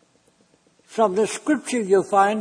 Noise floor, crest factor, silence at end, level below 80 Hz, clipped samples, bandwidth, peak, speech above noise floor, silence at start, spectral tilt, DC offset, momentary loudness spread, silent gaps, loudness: -61 dBFS; 16 dB; 0 s; -70 dBFS; under 0.1%; 10.5 kHz; -6 dBFS; 41 dB; 0.9 s; -4.5 dB/octave; under 0.1%; 5 LU; none; -21 LUFS